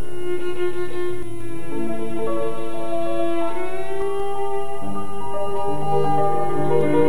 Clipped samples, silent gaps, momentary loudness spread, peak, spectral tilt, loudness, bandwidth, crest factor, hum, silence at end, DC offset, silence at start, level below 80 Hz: under 0.1%; none; 9 LU; -4 dBFS; -6.5 dB/octave; -25 LUFS; 17.5 kHz; 16 dB; none; 0 s; 20%; 0 s; -52 dBFS